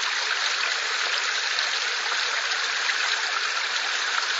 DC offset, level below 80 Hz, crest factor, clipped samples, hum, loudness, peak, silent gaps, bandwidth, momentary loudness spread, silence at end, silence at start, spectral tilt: under 0.1%; under -90 dBFS; 18 dB; under 0.1%; none; -23 LUFS; -8 dBFS; none; 8 kHz; 1 LU; 0 s; 0 s; 5 dB/octave